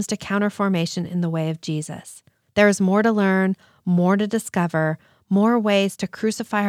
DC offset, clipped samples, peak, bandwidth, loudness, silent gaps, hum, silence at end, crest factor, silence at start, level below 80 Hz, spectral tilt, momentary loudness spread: under 0.1%; under 0.1%; -4 dBFS; 14.5 kHz; -21 LUFS; none; none; 0 s; 18 dB; 0 s; -64 dBFS; -6 dB/octave; 9 LU